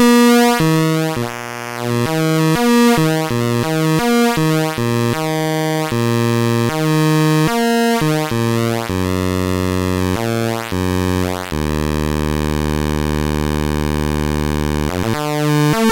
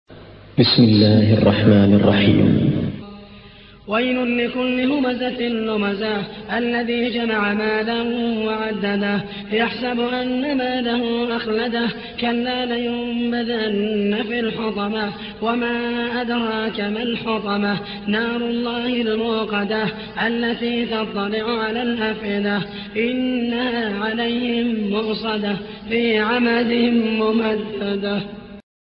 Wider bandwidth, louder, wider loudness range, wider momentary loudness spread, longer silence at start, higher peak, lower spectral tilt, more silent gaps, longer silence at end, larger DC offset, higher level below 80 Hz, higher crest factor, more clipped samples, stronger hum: first, 17 kHz vs 5.6 kHz; first, -16 LUFS vs -20 LUFS; about the same, 4 LU vs 5 LU; second, 6 LU vs 9 LU; about the same, 0 s vs 0.1 s; about the same, -2 dBFS vs -2 dBFS; second, -5.5 dB/octave vs -11 dB/octave; neither; second, 0 s vs 0.2 s; neither; first, -30 dBFS vs -50 dBFS; about the same, 12 dB vs 16 dB; neither; neither